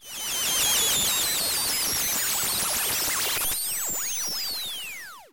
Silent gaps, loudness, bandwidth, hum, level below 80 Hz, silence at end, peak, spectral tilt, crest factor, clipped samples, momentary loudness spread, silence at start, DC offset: none; -23 LUFS; 17 kHz; none; -54 dBFS; 0.05 s; -10 dBFS; 0.5 dB/octave; 16 dB; under 0.1%; 8 LU; 0 s; under 0.1%